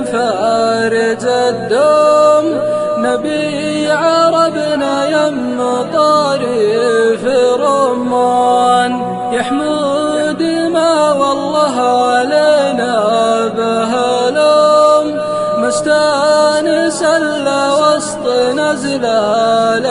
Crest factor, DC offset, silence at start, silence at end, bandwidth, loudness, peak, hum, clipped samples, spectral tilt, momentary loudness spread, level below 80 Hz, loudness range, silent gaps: 12 dB; under 0.1%; 0 s; 0 s; 11 kHz; -12 LUFS; 0 dBFS; none; under 0.1%; -4 dB/octave; 5 LU; -54 dBFS; 2 LU; none